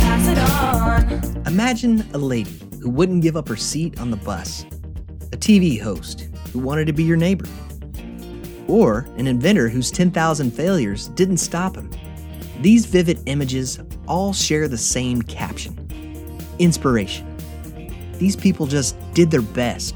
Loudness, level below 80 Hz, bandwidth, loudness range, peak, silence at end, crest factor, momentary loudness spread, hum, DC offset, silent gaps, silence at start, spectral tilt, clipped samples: -19 LUFS; -30 dBFS; over 20 kHz; 3 LU; -2 dBFS; 0 s; 16 dB; 18 LU; none; under 0.1%; none; 0 s; -5.5 dB/octave; under 0.1%